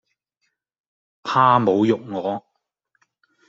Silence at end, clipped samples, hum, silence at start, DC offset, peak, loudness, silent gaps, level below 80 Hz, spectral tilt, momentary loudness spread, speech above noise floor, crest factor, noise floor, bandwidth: 1.1 s; under 0.1%; none; 1.25 s; under 0.1%; -2 dBFS; -19 LUFS; none; -68 dBFS; -7 dB/octave; 15 LU; 56 dB; 22 dB; -75 dBFS; 7.6 kHz